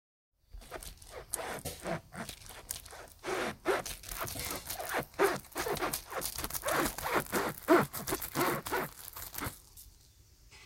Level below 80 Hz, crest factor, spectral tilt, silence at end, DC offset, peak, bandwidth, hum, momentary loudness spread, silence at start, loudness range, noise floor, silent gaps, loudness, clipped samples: -56 dBFS; 24 dB; -3.5 dB/octave; 0 s; under 0.1%; -12 dBFS; 17 kHz; none; 15 LU; 0.55 s; 7 LU; -61 dBFS; none; -35 LUFS; under 0.1%